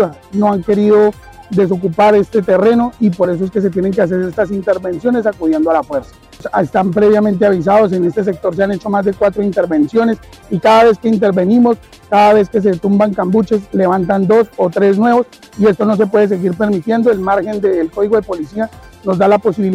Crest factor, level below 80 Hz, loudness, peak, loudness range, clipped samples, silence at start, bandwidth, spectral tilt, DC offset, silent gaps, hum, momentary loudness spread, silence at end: 10 dB; -44 dBFS; -13 LUFS; -2 dBFS; 3 LU; under 0.1%; 0 s; 12 kHz; -8 dB/octave; under 0.1%; none; none; 7 LU; 0 s